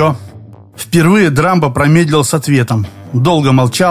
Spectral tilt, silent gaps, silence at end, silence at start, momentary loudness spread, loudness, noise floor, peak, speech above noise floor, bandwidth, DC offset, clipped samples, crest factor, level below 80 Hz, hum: -6 dB/octave; none; 0 s; 0 s; 8 LU; -11 LUFS; -34 dBFS; 0 dBFS; 24 dB; 15.5 kHz; 0.3%; under 0.1%; 10 dB; -40 dBFS; none